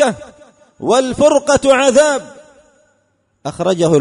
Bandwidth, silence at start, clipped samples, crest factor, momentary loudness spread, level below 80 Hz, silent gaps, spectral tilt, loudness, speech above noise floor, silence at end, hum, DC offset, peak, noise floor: 11 kHz; 0 s; under 0.1%; 14 dB; 16 LU; -46 dBFS; none; -4 dB/octave; -13 LUFS; 49 dB; 0 s; none; under 0.1%; 0 dBFS; -62 dBFS